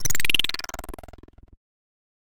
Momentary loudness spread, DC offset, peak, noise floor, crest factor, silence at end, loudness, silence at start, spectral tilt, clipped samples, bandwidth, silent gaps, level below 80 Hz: 21 LU; under 0.1%; -4 dBFS; -47 dBFS; 20 dB; 0.8 s; -24 LUFS; 0 s; -0.5 dB/octave; under 0.1%; 17 kHz; none; -44 dBFS